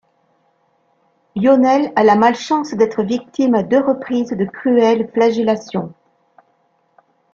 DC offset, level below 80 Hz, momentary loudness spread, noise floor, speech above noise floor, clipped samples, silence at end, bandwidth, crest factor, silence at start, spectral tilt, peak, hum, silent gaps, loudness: under 0.1%; -60 dBFS; 9 LU; -61 dBFS; 46 dB; under 0.1%; 1.4 s; 7.4 kHz; 16 dB; 1.35 s; -6.5 dB/octave; -2 dBFS; none; none; -16 LUFS